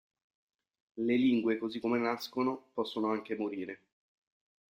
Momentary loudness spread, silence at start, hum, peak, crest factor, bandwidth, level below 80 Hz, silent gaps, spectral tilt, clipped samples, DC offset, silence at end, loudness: 13 LU; 0.95 s; none; -18 dBFS; 18 dB; 14 kHz; -76 dBFS; none; -6 dB/octave; under 0.1%; under 0.1%; 1 s; -33 LUFS